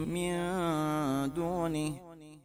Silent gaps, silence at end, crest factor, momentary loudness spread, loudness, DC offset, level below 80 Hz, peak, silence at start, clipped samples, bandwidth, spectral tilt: none; 0.05 s; 14 dB; 7 LU; -33 LUFS; under 0.1%; -56 dBFS; -18 dBFS; 0 s; under 0.1%; 16 kHz; -6 dB/octave